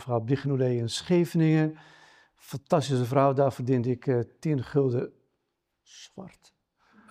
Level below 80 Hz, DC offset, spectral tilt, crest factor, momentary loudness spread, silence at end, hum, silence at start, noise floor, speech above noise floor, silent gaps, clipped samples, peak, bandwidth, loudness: -68 dBFS; under 0.1%; -7 dB/octave; 20 dB; 18 LU; 0.8 s; none; 0 s; -80 dBFS; 54 dB; none; under 0.1%; -8 dBFS; 15.5 kHz; -26 LUFS